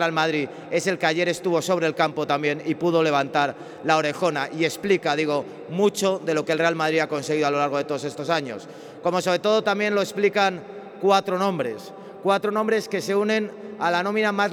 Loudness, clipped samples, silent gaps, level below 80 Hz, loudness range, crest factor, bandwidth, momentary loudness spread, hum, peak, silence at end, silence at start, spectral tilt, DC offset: -23 LUFS; under 0.1%; none; -74 dBFS; 1 LU; 16 dB; 17.5 kHz; 8 LU; none; -6 dBFS; 0 s; 0 s; -4.5 dB/octave; under 0.1%